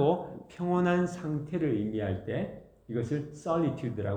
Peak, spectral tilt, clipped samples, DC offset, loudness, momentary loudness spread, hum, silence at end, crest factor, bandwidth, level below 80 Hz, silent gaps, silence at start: -14 dBFS; -8 dB/octave; under 0.1%; under 0.1%; -31 LUFS; 9 LU; none; 0 s; 16 dB; 9.2 kHz; -60 dBFS; none; 0 s